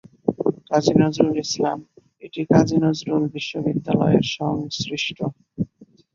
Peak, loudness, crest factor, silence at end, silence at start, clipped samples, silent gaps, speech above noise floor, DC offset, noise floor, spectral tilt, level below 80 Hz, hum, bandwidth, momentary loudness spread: -2 dBFS; -21 LUFS; 20 dB; 0.3 s; 0.25 s; under 0.1%; none; 31 dB; under 0.1%; -51 dBFS; -6 dB/octave; -52 dBFS; none; 7.6 kHz; 13 LU